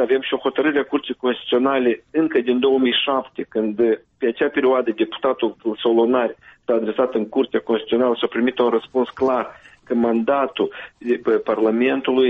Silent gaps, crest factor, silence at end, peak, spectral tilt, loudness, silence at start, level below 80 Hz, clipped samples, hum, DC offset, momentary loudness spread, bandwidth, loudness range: none; 12 dB; 0 s; -6 dBFS; -7 dB/octave; -20 LUFS; 0 s; -62 dBFS; under 0.1%; none; under 0.1%; 7 LU; 4.7 kHz; 1 LU